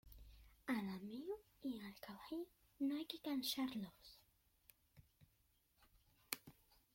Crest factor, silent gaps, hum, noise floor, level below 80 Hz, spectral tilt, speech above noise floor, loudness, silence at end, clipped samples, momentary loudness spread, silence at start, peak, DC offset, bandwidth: 28 dB; none; none; -79 dBFS; -72 dBFS; -4 dB/octave; 33 dB; -47 LUFS; 0.45 s; under 0.1%; 21 LU; 0.05 s; -22 dBFS; under 0.1%; 16.5 kHz